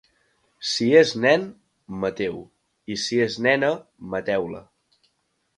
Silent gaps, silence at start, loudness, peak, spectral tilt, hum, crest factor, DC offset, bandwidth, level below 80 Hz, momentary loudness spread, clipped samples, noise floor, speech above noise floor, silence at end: none; 0.6 s; -22 LUFS; -2 dBFS; -4.5 dB/octave; none; 22 dB; under 0.1%; 10.5 kHz; -62 dBFS; 21 LU; under 0.1%; -71 dBFS; 49 dB; 0.95 s